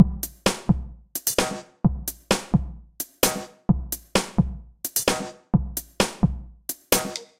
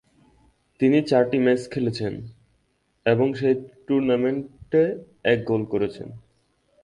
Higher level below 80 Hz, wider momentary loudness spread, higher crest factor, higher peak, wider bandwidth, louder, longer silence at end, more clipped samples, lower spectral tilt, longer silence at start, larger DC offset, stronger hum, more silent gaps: first, -36 dBFS vs -58 dBFS; about the same, 10 LU vs 11 LU; first, 24 dB vs 18 dB; first, -2 dBFS vs -6 dBFS; first, 16.5 kHz vs 11 kHz; about the same, -25 LUFS vs -23 LUFS; second, 0.15 s vs 0.65 s; neither; second, -4.5 dB/octave vs -7.5 dB/octave; second, 0 s vs 0.8 s; neither; neither; neither